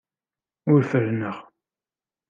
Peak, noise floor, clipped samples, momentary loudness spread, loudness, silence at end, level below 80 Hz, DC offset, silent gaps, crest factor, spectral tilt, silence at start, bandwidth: -6 dBFS; under -90 dBFS; under 0.1%; 13 LU; -23 LUFS; 0.9 s; -74 dBFS; under 0.1%; none; 20 dB; -9.5 dB/octave; 0.65 s; 7.4 kHz